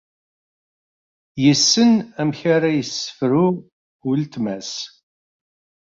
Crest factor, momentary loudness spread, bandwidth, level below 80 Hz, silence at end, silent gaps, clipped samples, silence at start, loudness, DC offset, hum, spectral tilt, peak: 18 dB; 16 LU; 7.6 kHz; -62 dBFS; 1 s; 3.72-4.00 s; under 0.1%; 1.35 s; -18 LUFS; under 0.1%; none; -4.5 dB/octave; -2 dBFS